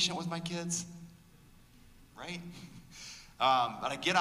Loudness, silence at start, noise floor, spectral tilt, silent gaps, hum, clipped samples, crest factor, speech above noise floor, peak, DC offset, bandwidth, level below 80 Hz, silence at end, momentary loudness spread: -33 LUFS; 0 s; -59 dBFS; -3 dB/octave; none; none; under 0.1%; 20 dB; 26 dB; -14 dBFS; under 0.1%; 15.5 kHz; -64 dBFS; 0 s; 22 LU